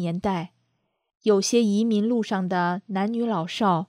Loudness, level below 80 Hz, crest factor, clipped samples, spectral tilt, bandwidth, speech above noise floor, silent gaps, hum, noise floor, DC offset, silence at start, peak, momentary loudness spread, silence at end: -24 LUFS; -62 dBFS; 16 dB; under 0.1%; -5.5 dB/octave; 14 kHz; 50 dB; 1.15-1.20 s; none; -73 dBFS; under 0.1%; 0 s; -8 dBFS; 7 LU; 0.05 s